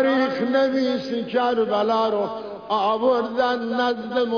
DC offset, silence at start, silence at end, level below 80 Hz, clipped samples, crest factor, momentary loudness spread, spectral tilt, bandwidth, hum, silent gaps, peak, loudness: under 0.1%; 0 s; 0 s; -64 dBFS; under 0.1%; 14 dB; 6 LU; -6 dB/octave; 5.4 kHz; none; none; -8 dBFS; -22 LUFS